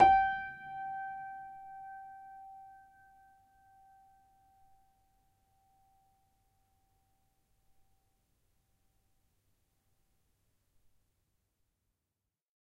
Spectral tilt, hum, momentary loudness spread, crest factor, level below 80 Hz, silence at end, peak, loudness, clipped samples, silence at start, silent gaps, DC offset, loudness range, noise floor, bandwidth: -5.5 dB/octave; none; 22 LU; 28 dB; -66 dBFS; 9.95 s; -10 dBFS; -35 LUFS; under 0.1%; 0 s; none; under 0.1%; 25 LU; -89 dBFS; 6 kHz